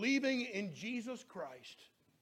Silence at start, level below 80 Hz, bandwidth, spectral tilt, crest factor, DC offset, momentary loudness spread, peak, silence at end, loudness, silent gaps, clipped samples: 0 s; -84 dBFS; 12.5 kHz; -4 dB/octave; 16 dB; under 0.1%; 21 LU; -24 dBFS; 0.35 s; -40 LUFS; none; under 0.1%